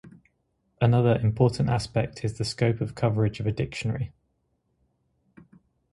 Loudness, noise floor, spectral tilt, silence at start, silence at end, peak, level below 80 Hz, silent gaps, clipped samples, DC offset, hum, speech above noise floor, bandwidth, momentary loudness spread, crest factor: -26 LUFS; -73 dBFS; -7 dB/octave; 0.05 s; 1.85 s; -8 dBFS; -50 dBFS; none; under 0.1%; under 0.1%; none; 49 dB; 11.5 kHz; 9 LU; 20 dB